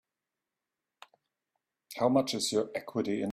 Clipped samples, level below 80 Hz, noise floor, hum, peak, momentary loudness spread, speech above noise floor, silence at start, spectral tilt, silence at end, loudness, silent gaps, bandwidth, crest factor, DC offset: under 0.1%; -74 dBFS; -89 dBFS; none; -14 dBFS; 7 LU; 59 dB; 1.9 s; -4.5 dB/octave; 0 s; -30 LUFS; none; 15.5 kHz; 20 dB; under 0.1%